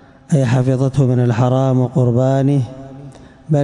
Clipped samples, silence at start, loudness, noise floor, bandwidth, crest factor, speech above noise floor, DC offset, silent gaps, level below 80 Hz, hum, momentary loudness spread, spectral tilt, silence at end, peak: under 0.1%; 0.3 s; -15 LUFS; -37 dBFS; 10.5 kHz; 10 dB; 24 dB; under 0.1%; none; -46 dBFS; none; 6 LU; -8.5 dB/octave; 0 s; -6 dBFS